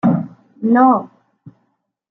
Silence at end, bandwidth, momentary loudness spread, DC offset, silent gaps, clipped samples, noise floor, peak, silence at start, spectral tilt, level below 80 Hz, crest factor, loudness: 0.6 s; 3.9 kHz; 13 LU; under 0.1%; none; under 0.1%; -68 dBFS; -2 dBFS; 0.05 s; -11 dB/octave; -64 dBFS; 16 dB; -15 LUFS